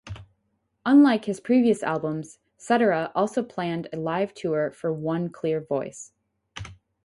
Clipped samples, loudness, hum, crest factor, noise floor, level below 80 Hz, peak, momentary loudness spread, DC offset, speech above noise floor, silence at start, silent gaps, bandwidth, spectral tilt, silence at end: under 0.1%; -24 LUFS; none; 16 dB; -73 dBFS; -58 dBFS; -8 dBFS; 22 LU; under 0.1%; 50 dB; 0.05 s; none; 11.5 kHz; -6.5 dB/octave; 0.3 s